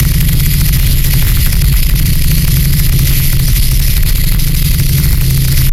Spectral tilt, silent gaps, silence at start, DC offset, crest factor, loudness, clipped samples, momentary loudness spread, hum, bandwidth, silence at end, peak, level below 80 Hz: -4 dB/octave; none; 0 s; under 0.1%; 8 dB; -11 LUFS; under 0.1%; 2 LU; none; 17 kHz; 0 s; 0 dBFS; -10 dBFS